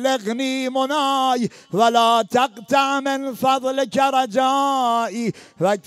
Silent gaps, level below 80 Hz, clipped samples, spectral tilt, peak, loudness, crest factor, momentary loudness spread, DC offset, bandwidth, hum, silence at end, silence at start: none; -70 dBFS; under 0.1%; -4 dB/octave; -4 dBFS; -19 LUFS; 16 dB; 7 LU; under 0.1%; 15.5 kHz; none; 0.05 s; 0 s